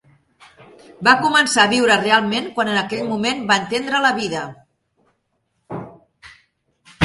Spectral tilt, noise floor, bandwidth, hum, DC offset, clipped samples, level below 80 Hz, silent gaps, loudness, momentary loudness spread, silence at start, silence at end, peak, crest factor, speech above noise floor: -3 dB/octave; -70 dBFS; 11.5 kHz; none; under 0.1%; under 0.1%; -56 dBFS; none; -17 LUFS; 19 LU; 1 s; 0 s; 0 dBFS; 20 dB; 52 dB